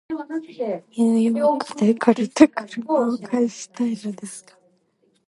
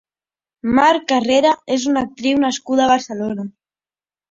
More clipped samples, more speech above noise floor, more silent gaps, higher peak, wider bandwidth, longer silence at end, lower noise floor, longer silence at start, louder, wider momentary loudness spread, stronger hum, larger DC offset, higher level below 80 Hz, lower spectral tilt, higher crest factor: neither; second, 44 dB vs over 74 dB; neither; about the same, 0 dBFS vs -2 dBFS; first, 11.5 kHz vs 7.8 kHz; about the same, 0.9 s vs 0.8 s; second, -65 dBFS vs under -90 dBFS; second, 0.1 s vs 0.65 s; second, -21 LUFS vs -17 LUFS; first, 14 LU vs 11 LU; neither; neither; second, -66 dBFS vs -54 dBFS; first, -5.5 dB/octave vs -4 dB/octave; first, 22 dB vs 16 dB